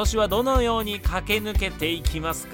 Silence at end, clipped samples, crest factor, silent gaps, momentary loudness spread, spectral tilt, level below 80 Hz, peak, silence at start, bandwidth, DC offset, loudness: 0 s; under 0.1%; 16 dB; none; 5 LU; -4.5 dB/octave; -28 dBFS; -8 dBFS; 0 s; 17 kHz; under 0.1%; -24 LUFS